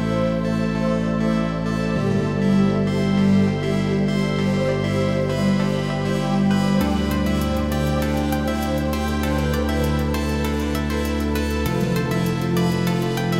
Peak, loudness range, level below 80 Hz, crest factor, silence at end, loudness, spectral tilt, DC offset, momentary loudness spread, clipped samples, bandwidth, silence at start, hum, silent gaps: -8 dBFS; 2 LU; -32 dBFS; 12 dB; 0 s; -21 LUFS; -6.5 dB/octave; under 0.1%; 4 LU; under 0.1%; 16.5 kHz; 0 s; none; none